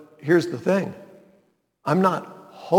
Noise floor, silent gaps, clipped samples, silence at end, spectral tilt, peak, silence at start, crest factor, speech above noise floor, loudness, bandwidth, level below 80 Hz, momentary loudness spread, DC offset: -64 dBFS; none; under 0.1%; 0 s; -7 dB/octave; -4 dBFS; 0 s; 20 dB; 42 dB; -23 LUFS; 17.5 kHz; -74 dBFS; 21 LU; under 0.1%